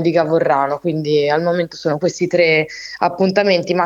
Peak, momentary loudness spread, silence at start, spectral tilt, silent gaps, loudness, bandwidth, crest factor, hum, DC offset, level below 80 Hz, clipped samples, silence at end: 0 dBFS; 6 LU; 0 s; -5.5 dB/octave; none; -16 LUFS; 7.8 kHz; 16 dB; none; under 0.1%; -60 dBFS; under 0.1%; 0 s